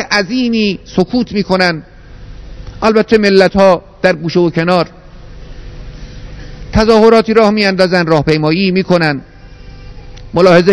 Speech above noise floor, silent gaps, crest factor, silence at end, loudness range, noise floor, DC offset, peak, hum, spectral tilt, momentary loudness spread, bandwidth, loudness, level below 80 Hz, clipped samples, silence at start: 23 dB; none; 12 dB; 0 s; 4 LU; -33 dBFS; under 0.1%; 0 dBFS; none; -6 dB/octave; 24 LU; 11 kHz; -11 LUFS; -32 dBFS; 1%; 0 s